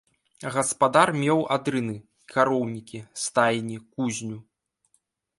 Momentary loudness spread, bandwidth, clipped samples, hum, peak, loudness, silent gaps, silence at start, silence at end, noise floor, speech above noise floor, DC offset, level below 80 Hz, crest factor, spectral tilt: 17 LU; 11.5 kHz; under 0.1%; none; -4 dBFS; -24 LUFS; none; 0.4 s; 1 s; -71 dBFS; 46 dB; under 0.1%; -68 dBFS; 22 dB; -4.5 dB/octave